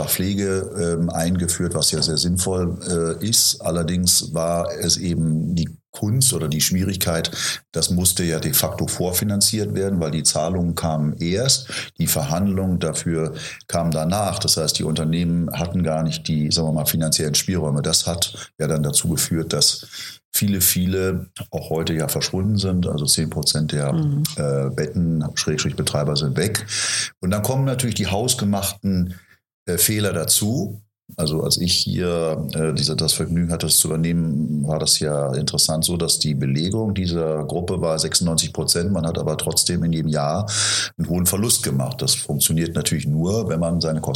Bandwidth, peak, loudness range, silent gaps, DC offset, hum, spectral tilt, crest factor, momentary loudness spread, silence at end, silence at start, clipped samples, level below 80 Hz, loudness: 17 kHz; -2 dBFS; 2 LU; 5.89-5.93 s, 20.25-20.32 s, 29.54-29.66 s; under 0.1%; none; -4 dB/octave; 18 dB; 6 LU; 0 s; 0 s; under 0.1%; -44 dBFS; -20 LUFS